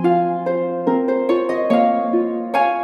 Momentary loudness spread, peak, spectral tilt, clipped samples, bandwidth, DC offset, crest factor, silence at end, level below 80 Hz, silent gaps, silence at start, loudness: 4 LU; -4 dBFS; -8 dB/octave; under 0.1%; 11.5 kHz; under 0.1%; 14 dB; 0 s; -70 dBFS; none; 0 s; -19 LUFS